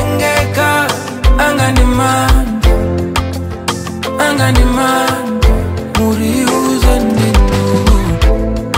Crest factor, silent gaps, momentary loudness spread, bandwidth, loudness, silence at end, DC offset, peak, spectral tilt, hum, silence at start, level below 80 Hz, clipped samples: 10 dB; none; 6 LU; 16.5 kHz; -13 LUFS; 0 s; under 0.1%; 0 dBFS; -5 dB/octave; none; 0 s; -16 dBFS; under 0.1%